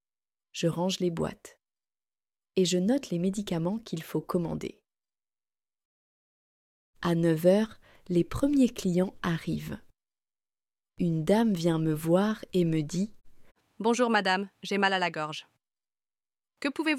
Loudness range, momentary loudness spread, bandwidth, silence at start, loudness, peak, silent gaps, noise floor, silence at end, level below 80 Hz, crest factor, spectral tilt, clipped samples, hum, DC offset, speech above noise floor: 6 LU; 11 LU; 15.5 kHz; 0.55 s; -28 LUFS; -10 dBFS; 5.85-6.93 s; under -90 dBFS; 0 s; -56 dBFS; 20 dB; -6 dB/octave; under 0.1%; none; under 0.1%; over 62 dB